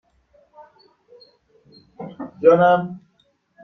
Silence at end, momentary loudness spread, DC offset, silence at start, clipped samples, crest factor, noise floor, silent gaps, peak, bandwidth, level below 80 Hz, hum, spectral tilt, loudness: 0.65 s; 24 LU; under 0.1%; 2 s; under 0.1%; 20 dB; -64 dBFS; none; -2 dBFS; 6 kHz; -66 dBFS; none; -8.5 dB/octave; -16 LUFS